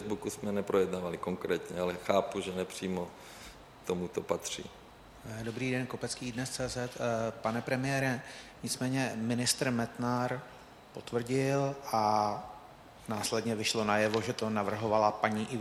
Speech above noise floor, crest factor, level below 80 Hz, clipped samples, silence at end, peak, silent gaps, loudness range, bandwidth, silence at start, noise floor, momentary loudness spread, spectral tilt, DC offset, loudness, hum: 20 dB; 22 dB; -62 dBFS; under 0.1%; 0 s; -12 dBFS; none; 6 LU; 17 kHz; 0 s; -53 dBFS; 17 LU; -4.5 dB/octave; under 0.1%; -33 LUFS; none